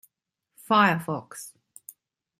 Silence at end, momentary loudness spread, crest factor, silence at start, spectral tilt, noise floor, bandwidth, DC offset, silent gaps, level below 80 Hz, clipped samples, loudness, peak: 0.9 s; 26 LU; 22 dB; 0.7 s; -5 dB/octave; -81 dBFS; 16 kHz; under 0.1%; none; -74 dBFS; under 0.1%; -23 LUFS; -6 dBFS